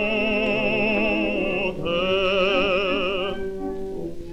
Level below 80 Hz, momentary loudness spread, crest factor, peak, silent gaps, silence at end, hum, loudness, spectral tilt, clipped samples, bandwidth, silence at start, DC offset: -40 dBFS; 11 LU; 14 dB; -8 dBFS; none; 0 s; none; -22 LUFS; -6 dB/octave; under 0.1%; 11 kHz; 0 s; under 0.1%